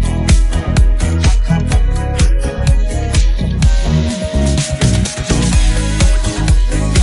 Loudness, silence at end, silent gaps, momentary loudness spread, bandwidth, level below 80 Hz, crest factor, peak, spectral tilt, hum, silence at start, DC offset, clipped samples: -14 LUFS; 0 s; none; 3 LU; 11.5 kHz; -14 dBFS; 12 dB; 0 dBFS; -5 dB/octave; none; 0 s; under 0.1%; under 0.1%